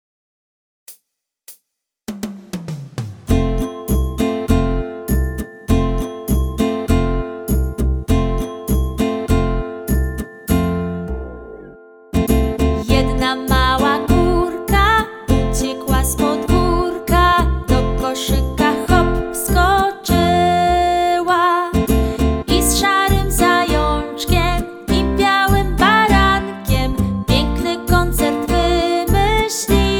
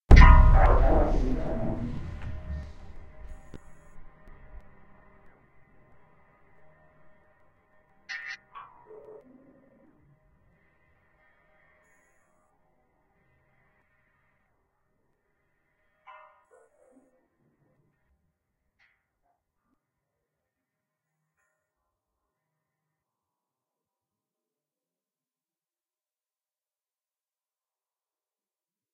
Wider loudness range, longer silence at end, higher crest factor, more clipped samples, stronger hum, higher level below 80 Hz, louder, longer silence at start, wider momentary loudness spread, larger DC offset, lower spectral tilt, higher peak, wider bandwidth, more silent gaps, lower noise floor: second, 6 LU vs 29 LU; second, 0 s vs 20.6 s; second, 16 dB vs 28 dB; neither; neither; first, -22 dBFS vs -30 dBFS; first, -17 LUFS vs -24 LUFS; first, 0.9 s vs 0.1 s; second, 10 LU vs 33 LU; neither; second, -5 dB/octave vs -7.5 dB/octave; about the same, 0 dBFS vs 0 dBFS; first, over 20 kHz vs 6.2 kHz; neither; second, -72 dBFS vs under -90 dBFS